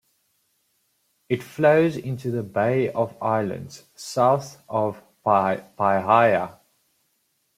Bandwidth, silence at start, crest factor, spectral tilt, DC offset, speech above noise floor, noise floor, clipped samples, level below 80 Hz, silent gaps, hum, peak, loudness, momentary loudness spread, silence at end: 15.5 kHz; 1.3 s; 20 dB; -6.5 dB/octave; under 0.1%; 49 dB; -71 dBFS; under 0.1%; -66 dBFS; none; none; -2 dBFS; -22 LUFS; 12 LU; 1.05 s